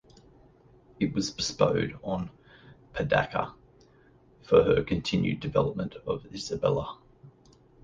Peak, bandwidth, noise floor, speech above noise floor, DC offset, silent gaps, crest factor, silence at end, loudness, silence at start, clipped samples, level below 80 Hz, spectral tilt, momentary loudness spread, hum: -8 dBFS; 9.6 kHz; -59 dBFS; 32 dB; under 0.1%; none; 22 dB; 0.55 s; -28 LUFS; 1 s; under 0.1%; -52 dBFS; -5.5 dB/octave; 12 LU; none